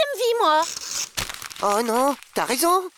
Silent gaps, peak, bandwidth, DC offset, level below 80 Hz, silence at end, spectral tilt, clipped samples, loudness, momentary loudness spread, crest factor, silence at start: none; -10 dBFS; over 20 kHz; under 0.1%; -54 dBFS; 0.1 s; -2 dB/octave; under 0.1%; -22 LUFS; 8 LU; 14 dB; 0 s